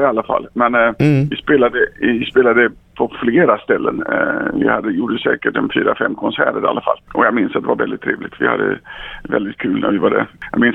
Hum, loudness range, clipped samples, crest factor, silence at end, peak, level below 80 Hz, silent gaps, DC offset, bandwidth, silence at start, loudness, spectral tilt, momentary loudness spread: none; 3 LU; under 0.1%; 16 dB; 0 s; 0 dBFS; -46 dBFS; none; under 0.1%; 8.4 kHz; 0 s; -16 LUFS; -8 dB/octave; 7 LU